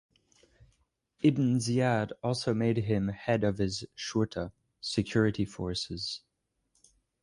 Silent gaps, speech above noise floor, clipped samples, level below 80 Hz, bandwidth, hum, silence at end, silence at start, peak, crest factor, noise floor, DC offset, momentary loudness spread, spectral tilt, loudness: none; 47 dB; under 0.1%; -56 dBFS; 11.5 kHz; none; 1.05 s; 1.25 s; -12 dBFS; 20 dB; -76 dBFS; under 0.1%; 9 LU; -6 dB/octave; -30 LUFS